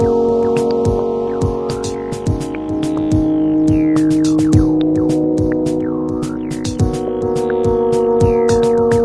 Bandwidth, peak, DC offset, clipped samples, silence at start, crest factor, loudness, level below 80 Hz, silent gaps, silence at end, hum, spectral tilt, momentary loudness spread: 11 kHz; 0 dBFS; under 0.1%; under 0.1%; 0 s; 14 dB; -16 LUFS; -32 dBFS; none; 0 s; none; -7.5 dB/octave; 8 LU